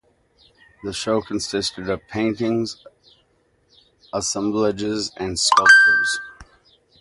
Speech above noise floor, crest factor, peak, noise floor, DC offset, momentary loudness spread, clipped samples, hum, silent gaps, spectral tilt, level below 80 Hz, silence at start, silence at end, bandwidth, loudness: 43 dB; 22 dB; 0 dBFS; -63 dBFS; under 0.1%; 19 LU; under 0.1%; none; none; -2.5 dB/octave; -52 dBFS; 0.85 s; 0.55 s; 11.5 kHz; -19 LUFS